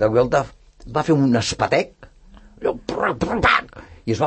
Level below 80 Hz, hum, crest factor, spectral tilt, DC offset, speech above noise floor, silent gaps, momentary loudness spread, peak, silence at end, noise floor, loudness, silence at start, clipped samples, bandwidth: -42 dBFS; none; 18 dB; -5.5 dB/octave; under 0.1%; 27 dB; none; 13 LU; -2 dBFS; 0 s; -46 dBFS; -20 LUFS; 0 s; under 0.1%; 8.8 kHz